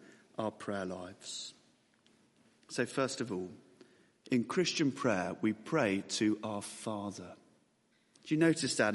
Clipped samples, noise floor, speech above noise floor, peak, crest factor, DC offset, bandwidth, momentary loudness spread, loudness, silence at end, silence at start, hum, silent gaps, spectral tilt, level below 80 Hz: under 0.1%; -73 dBFS; 38 dB; -14 dBFS; 20 dB; under 0.1%; 11.5 kHz; 14 LU; -35 LUFS; 0 s; 0 s; none; none; -4.5 dB/octave; -78 dBFS